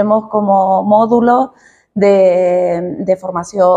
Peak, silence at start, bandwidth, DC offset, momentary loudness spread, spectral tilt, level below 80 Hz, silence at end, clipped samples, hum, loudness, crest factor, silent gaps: 0 dBFS; 0 s; 9.6 kHz; under 0.1%; 8 LU; -7.5 dB/octave; -54 dBFS; 0 s; under 0.1%; none; -12 LUFS; 12 dB; none